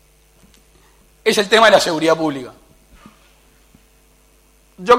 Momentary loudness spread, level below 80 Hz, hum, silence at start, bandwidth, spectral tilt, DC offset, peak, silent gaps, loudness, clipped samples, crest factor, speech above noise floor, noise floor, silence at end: 19 LU; -52 dBFS; none; 1.25 s; 16.5 kHz; -3 dB/octave; under 0.1%; 0 dBFS; none; -15 LUFS; under 0.1%; 18 dB; 39 dB; -53 dBFS; 0 s